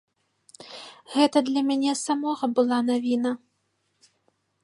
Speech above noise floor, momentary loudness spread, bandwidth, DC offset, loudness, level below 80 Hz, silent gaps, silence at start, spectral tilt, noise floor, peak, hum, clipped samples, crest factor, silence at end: 50 dB; 20 LU; 11.5 kHz; under 0.1%; -24 LUFS; -80 dBFS; none; 0.6 s; -3.5 dB/octave; -73 dBFS; -6 dBFS; none; under 0.1%; 20 dB; 1.25 s